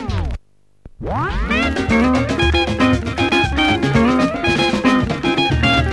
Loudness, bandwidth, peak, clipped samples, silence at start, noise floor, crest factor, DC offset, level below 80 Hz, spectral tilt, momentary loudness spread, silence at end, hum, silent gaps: -16 LUFS; 11.5 kHz; -2 dBFS; under 0.1%; 0 s; -45 dBFS; 14 dB; 0.3%; -28 dBFS; -5.5 dB/octave; 8 LU; 0 s; none; none